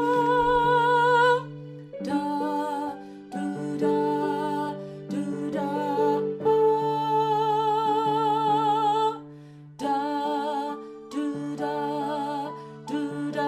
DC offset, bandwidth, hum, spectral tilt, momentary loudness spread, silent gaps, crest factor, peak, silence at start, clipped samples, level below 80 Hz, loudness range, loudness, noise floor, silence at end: under 0.1%; 15 kHz; none; -6 dB/octave; 14 LU; none; 16 dB; -10 dBFS; 0 s; under 0.1%; -58 dBFS; 6 LU; -25 LUFS; -45 dBFS; 0 s